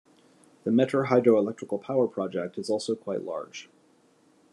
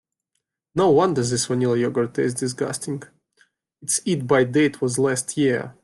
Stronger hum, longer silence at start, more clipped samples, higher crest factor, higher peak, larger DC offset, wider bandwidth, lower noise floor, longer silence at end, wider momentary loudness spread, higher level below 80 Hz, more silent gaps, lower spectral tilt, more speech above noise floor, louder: neither; about the same, 0.65 s vs 0.75 s; neither; about the same, 20 dB vs 16 dB; about the same, -8 dBFS vs -6 dBFS; neither; about the same, 11.5 kHz vs 12.5 kHz; second, -62 dBFS vs -78 dBFS; first, 0.9 s vs 0.1 s; first, 14 LU vs 10 LU; second, -78 dBFS vs -60 dBFS; neither; first, -6.5 dB/octave vs -5 dB/octave; second, 36 dB vs 57 dB; second, -27 LUFS vs -21 LUFS